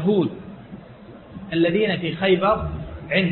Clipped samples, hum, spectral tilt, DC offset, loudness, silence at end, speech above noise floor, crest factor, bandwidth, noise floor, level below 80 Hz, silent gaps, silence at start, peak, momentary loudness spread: under 0.1%; none; -11 dB/octave; under 0.1%; -21 LUFS; 0 s; 22 dB; 16 dB; 4.3 kHz; -42 dBFS; -42 dBFS; none; 0 s; -6 dBFS; 22 LU